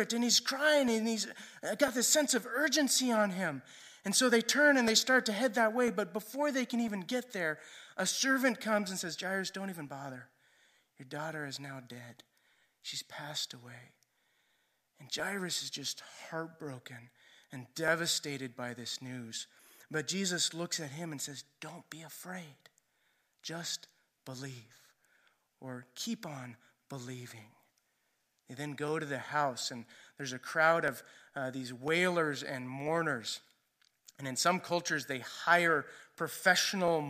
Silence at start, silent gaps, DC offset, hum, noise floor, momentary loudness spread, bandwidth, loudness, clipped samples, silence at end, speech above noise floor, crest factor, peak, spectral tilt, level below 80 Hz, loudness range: 0 s; none; under 0.1%; none; -78 dBFS; 20 LU; 15.5 kHz; -32 LUFS; under 0.1%; 0 s; 44 dB; 24 dB; -12 dBFS; -2.5 dB/octave; -82 dBFS; 16 LU